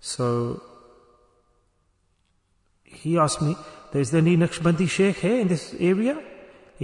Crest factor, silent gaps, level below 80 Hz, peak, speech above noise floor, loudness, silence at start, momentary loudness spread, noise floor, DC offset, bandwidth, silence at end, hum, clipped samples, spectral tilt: 16 dB; none; -56 dBFS; -8 dBFS; 45 dB; -23 LUFS; 0.05 s; 13 LU; -67 dBFS; under 0.1%; 11 kHz; 0 s; none; under 0.1%; -6 dB/octave